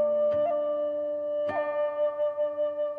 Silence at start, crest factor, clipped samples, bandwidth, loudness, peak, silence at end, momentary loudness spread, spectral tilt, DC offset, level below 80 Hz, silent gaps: 0 s; 10 dB; under 0.1%; 3.7 kHz; -28 LUFS; -18 dBFS; 0 s; 5 LU; -7 dB/octave; under 0.1%; -74 dBFS; none